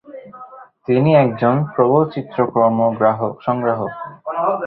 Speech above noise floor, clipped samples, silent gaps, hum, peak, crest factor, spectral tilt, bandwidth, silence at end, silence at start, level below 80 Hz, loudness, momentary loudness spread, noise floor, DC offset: 24 dB; under 0.1%; none; none; -2 dBFS; 16 dB; -12 dB/octave; 5 kHz; 0 s; 0.1 s; -58 dBFS; -17 LUFS; 19 LU; -39 dBFS; under 0.1%